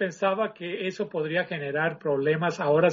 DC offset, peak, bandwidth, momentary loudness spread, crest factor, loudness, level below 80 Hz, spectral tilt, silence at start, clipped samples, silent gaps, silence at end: under 0.1%; -10 dBFS; 7.4 kHz; 7 LU; 16 dB; -27 LUFS; -72 dBFS; -4.5 dB/octave; 0 s; under 0.1%; none; 0 s